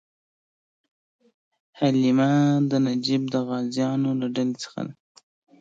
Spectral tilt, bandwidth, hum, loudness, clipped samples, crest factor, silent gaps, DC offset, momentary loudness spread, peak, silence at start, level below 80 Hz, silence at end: -6.5 dB/octave; 7.8 kHz; none; -23 LUFS; under 0.1%; 16 dB; none; under 0.1%; 11 LU; -10 dBFS; 1.75 s; -72 dBFS; 0.7 s